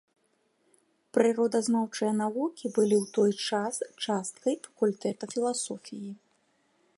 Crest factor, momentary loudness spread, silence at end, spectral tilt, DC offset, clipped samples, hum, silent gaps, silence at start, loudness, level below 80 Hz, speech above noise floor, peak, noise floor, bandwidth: 20 dB; 9 LU; 0.85 s; -4.5 dB/octave; under 0.1%; under 0.1%; none; none; 1.15 s; -29 LUFS; -80 dBFS; 44 dB; -10 dBFS; -72 dBFS; 11.5 kHz